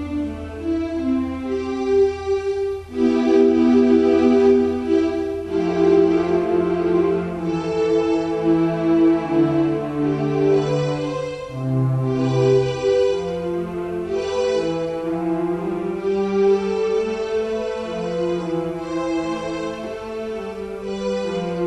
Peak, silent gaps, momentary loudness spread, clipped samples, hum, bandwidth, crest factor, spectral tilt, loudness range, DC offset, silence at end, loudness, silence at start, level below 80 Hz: -4 dBFS; none; 11 LU; under 0.1%; none; 9.4 kHz; 16 dB; -7.5 dB/octave; 7 LU; under 0.1%; 0 s; -20 LUFS; 0 s; -46 dBFS